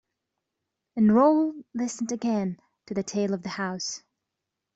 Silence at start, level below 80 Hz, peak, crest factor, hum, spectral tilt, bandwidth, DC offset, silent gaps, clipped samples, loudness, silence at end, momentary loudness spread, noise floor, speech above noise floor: 0.95 s; -68 dBFS; -10 dBFS; 18 dB; none; -5.5 dB/octave; 8 kHz; under 0.1%; none; under 0.1%; -26 LUFS; 0.75 s; 14 LU; -85 dBFS; 60 dB